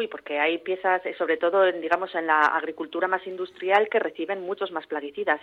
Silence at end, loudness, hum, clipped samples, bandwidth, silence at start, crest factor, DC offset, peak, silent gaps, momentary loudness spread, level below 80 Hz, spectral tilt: 0 s; -25 LUFS; none; under 0.1%; 7.8 kHz; 0 s; 18 dB; under 0.1%; -6 dBFS; none; 10 LU; -74 dBFS; -5 dB/octave